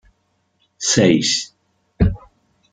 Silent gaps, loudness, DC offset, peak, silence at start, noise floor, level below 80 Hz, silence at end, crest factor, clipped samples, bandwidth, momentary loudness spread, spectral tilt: none; -17 LUFS; under 0.1%; -2 dBFS; 0.8 s; -66 dBFS; -34 dBFS; 0.55 s; 18 dB; under 0.1%; 10 kHz; 16 LU; -4 dB/octave